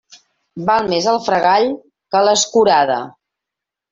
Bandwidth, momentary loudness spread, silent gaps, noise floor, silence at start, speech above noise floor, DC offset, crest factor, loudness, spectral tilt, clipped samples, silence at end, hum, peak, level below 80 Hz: 7.8 kHz; 10 LU; none; -84 dBFS; 0.55 s; 70 dB; under 0.1%; 14 dB; -15 LUFS; -3 dB/octave; under 0.1%; 0.8 s; none; -2 dBFS; -58 dBFS